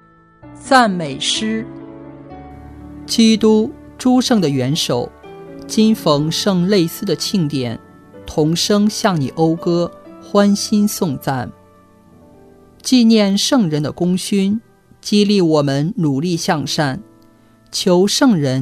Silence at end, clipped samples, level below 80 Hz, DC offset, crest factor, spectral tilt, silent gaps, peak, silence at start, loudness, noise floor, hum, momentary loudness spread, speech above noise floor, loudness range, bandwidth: 0 s; under 0.1%; -50 dBFS; under 0.1%; 16 dB; -5 dB/octave; none; 0 dBFS; 0.45 s; -16 LUFS; -49 dBFS; none; 19 LU; 34 dB; 2 LU; 14 kHz